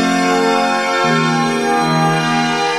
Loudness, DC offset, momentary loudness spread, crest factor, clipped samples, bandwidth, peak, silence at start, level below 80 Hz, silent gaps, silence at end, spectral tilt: -14 LUFS; under 0.1%; 1 LU; 12 dB; under 0.1%; 14.5 kHz; -2 dBFS; 0 s; -60 dBFS; none; 0 s; -4.5 dB/octave